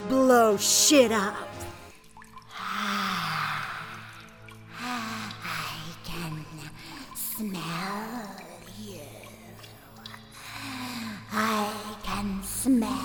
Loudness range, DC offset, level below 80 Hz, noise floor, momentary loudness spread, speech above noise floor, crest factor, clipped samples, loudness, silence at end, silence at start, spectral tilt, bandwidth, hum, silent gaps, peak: 13 LU; under 0.1%; -54 dBFS; -49 dBFS; 24 LU; 26 dB; 22 dB; under 0.1%; -27 LUFS; 0 s; 0 s; -3 dB/octave; over 20 kHz; none; none; -6 dBFS